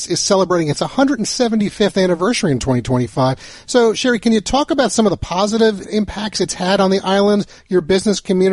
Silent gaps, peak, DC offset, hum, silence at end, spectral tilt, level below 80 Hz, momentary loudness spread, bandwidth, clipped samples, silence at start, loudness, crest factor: none; -2 dBFS; under 0.1%; none; 0 s; -4.5 dB/octave; -40 dBFS; 5 LU; 11.5 kHz; under 0.1%; 0 s; -16 LUFS; 14 dB